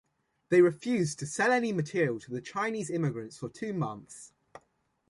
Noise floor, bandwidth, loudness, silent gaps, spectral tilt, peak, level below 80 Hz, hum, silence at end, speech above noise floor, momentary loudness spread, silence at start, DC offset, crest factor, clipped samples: -73 dBFS; 11.5 kHz; -30 LUFS; none; -6 dB/octave; -12 dBFS; -70 dBFS; none; 0.5 s; 44 dB; 16 LU; 0.5 s; under 0.1%; 18 dB; under 0.1%